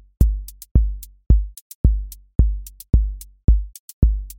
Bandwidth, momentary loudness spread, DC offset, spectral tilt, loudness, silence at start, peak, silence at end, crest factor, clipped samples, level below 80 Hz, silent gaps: 17 kHz; 12 LU; under 0.1%; -8.5 dB/octave; -22 LUFS; 0.2 s; -2 dBFS; 0.05 s; 18 dB; under 0.1%; -20 dBFS; 0.71-0.75 s, 1.61-1.84 s, 2.35-2.39 s, 3.44-3.48 s, 3.79-4.02 s